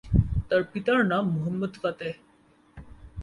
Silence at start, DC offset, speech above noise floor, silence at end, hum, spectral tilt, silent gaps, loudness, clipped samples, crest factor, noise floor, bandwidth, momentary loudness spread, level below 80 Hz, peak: 0.05 s; under 0.1%; 29 dB; 0 s; none; -8.5 dB/octave; none; -27 LUFS; under 0.1%; 20 dB; -56 dBFS; 11 kHz; 13 LU; -38 dBFS; -6 dBFS